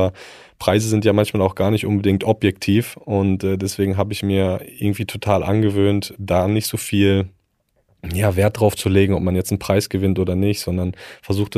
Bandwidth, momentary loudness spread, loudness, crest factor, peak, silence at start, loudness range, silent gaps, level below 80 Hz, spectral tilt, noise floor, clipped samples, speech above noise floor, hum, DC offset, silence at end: 15.5 kHz; 7 LU; -19 LUFS; 18 dB; 0 dBFS; 0 s; 1 LU; none; -44 dBFS; -6 dB/octave; -66 dBFS; under 0.1%; 47 dB; none; under 0.1%; 0 s